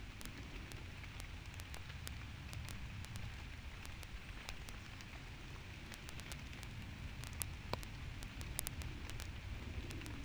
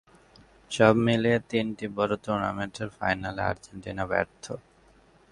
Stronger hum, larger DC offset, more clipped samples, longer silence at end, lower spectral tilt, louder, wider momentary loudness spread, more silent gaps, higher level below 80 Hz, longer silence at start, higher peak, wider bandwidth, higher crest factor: neither; neither; neither; second, 0 s vs 0.7 s; second, -4 dB/octave vs -6 dB/octave; second, -49 LUFS vs -27 LUFS; second, 6 LU vs 16 LU; neither; about the same, -52 dBFS vs -54 dBFS; second, 0 s vs 0.7 s; second, -16 dBFS vs -4 dBFS; first, over 20 kHz vs 11.5 kHz; first, 32 dB vs 24 dB